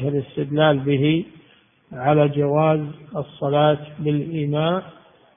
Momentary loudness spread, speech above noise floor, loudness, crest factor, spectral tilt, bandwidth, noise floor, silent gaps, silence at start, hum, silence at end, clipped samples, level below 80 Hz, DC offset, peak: 11 LU; 35 dB; -21 LUFS; 18 dB; -12 dB/octave; 3.7 kHz; -55 dBFS; none; 0 s; none; 0.45 s; under 0.1%; -58 dBFS; under 0.1%; -2 dBFS